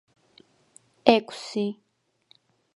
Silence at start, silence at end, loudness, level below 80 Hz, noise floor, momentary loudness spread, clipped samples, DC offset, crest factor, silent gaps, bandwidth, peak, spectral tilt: 1.05 s; 1 s; -25 LUFS; -68 dBFS; -64 dBFS; 12 LU; under 0.1%; under 0.1%; 28 dB; none; 11.5 kHz; 0 dBFS; -5 dB/octave